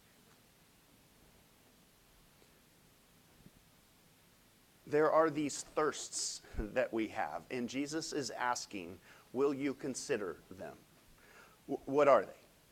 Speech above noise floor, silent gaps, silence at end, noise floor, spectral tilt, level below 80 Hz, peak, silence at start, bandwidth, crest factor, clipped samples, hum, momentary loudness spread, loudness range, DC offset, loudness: 31 dB; none; 0.35 s; -66 dBFS; -3.5 dB/octave; -60 dBFS; -14 dBFS; 4.85 s; 16 kHz; 24 dB; under 0.1%; none; 19 LU; 4 LU; under 0.1%; -35 LUFS